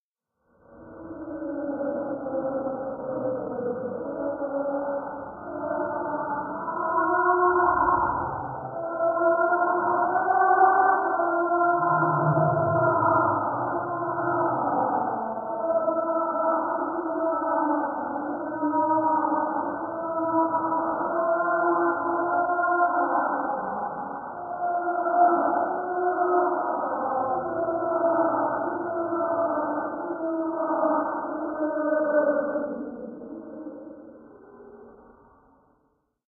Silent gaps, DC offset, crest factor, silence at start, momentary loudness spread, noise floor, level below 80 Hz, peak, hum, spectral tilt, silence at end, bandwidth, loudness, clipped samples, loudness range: none; under 0.1%; 18 dB; 0.7 s; 11 LU; -75 dBFS; -60 dBFS; -6 dBFS; none; -14 dB/octave; 1.35 s; 1.7 kHz; -25 LUFS; under 0.1%; 8 LU